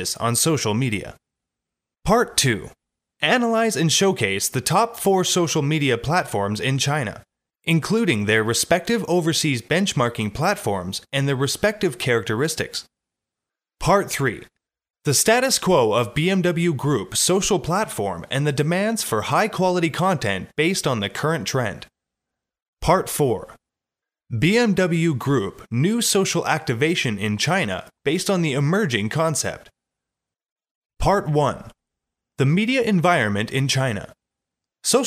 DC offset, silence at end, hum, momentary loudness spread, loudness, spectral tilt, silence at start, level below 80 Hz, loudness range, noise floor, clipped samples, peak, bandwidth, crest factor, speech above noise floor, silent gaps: under 0.1%; 0 s; none; 7 LU; -21 LUFS; -4 dB/octave; 0 s; -46 dBFS; 4 LU; -88 dBFS; under 0.1%; -4 dBFS; 16 kHz; 18 dB; 68 dB; 22.62-22.73 s, 30.52-30.56 s, 30.71-30.90 s